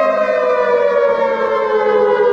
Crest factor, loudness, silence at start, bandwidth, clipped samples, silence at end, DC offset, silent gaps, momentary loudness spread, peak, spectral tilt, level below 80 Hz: 12 dB; -14 LUFS; 0 s; 7.2 kHz; under 0.1%; 0 s; under 0.1%; none; 2 LU; -2 dBFS; -5 dB/octave; -56 dBFS